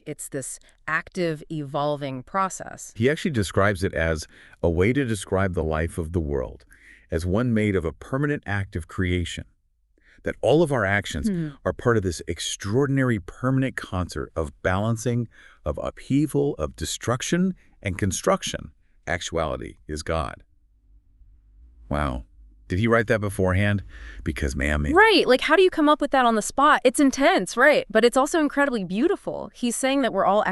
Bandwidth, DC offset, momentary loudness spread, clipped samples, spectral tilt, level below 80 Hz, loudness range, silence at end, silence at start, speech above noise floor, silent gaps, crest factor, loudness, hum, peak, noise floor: 12 kHz; under 0.1%; 14 LU; under 0.1%; -5 dB/octave; -40 dBFS; 9 LU; 0 s; 0.05 s; 41 dB; none; 20 dB; -23 LUFS; none; -4 dBFS; -64 dBFS